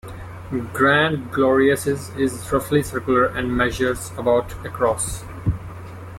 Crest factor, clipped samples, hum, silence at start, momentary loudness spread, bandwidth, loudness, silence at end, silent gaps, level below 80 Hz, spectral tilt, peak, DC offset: 16 dB; under 0.1%; none; 0.05 s; 13 LU; 16.5 kHz; -20 LUFS; 0 s; none; -40 dBFS; -5 dB/octave; -6 dBFS; under 0.1%